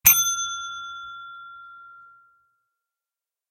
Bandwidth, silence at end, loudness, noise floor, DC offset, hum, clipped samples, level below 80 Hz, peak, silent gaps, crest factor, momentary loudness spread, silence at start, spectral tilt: 16 kHz; 1.5 s; -22 LUFS; -90 dBFS; under 0.1%; none; under 0.1%; -56 dBFS; -2 dBFS; none; 26 dB; 25 LU; 0.05 s; 2 dB/octave